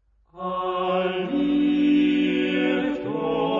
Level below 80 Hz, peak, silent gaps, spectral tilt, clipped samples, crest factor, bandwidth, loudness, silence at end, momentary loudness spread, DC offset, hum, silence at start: -56 dBFS; -10 dBFS; none; -7.5 dB/octave; under 0.1%; 12 dB; 5.6 kHz; -23 LUFS; 0 s; 8 LU; under 0.1%; none; 0.35 s